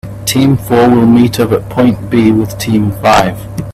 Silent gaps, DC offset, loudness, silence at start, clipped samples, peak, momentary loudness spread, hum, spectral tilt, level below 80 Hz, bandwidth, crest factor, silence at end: none; under 0.1%; -10 LUFS; 0.05 s; under 0.1%; 0 dBFS; 6 LU; none; -6 dB/octave; -34 dBFS; 15 kHz; 10 dB; 0 s